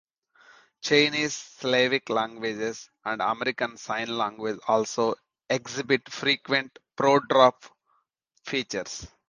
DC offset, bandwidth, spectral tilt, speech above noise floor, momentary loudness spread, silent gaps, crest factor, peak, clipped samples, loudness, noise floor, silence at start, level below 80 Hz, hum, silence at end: under 0.1%; 10 kHz; -3.5 dB/octave; 45 dB; 12 LU; none; 22 dB; -4 dBFS; under 0.1%; -26 LUFS; -71 dBFS; 0.85 s; -66 dBFS; none; 0.2 s